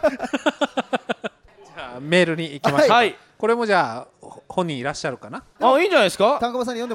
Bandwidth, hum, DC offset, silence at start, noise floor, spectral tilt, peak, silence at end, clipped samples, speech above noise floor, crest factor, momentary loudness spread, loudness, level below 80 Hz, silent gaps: 16 kHz; none; under 0.1%; 0.05 s; -47 dBFS; -4.5 dB/octave; -2 dBFS; 0 s; under 0.1%; 28 dB; 20 dB; 17 LU; -20 LUFS; -58 dBFS; none